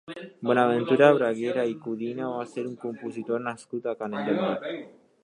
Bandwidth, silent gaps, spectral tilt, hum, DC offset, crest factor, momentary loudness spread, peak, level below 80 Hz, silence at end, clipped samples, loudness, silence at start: 10.5 kHz; none; -6.5 dB/octave; none; under 0.1%; 24 dB; 15 LU; -4 dBFS; -78 dBFS; 0.35 s; under 0.1%; -26 LUFS; 0.1 s